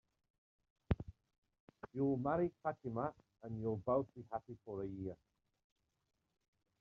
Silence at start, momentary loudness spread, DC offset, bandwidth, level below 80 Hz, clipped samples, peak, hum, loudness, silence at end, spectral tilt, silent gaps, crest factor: 0.9 s; 13 LU; under 0.1%; 6.2 kHz; -62 dBFS; under 0.1%; -20 dBFS; none; -42 LUFS; 1.65 s; -9 dB/octave; 1.38-1.42 s, 1.60-1.68 s; 22 dB